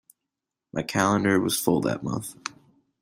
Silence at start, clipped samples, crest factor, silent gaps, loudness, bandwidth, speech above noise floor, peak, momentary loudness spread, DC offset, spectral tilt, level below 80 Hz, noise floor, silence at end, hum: 0.75 s; under 0.1%; 20 dB; none; -25 LUFS; 16 kHz; 61 dB; -6 dBFS; 14 LU; under 0.1%; -4.5 dB/octave; -60 dBFS; -86 dBFS; 0.55 s; none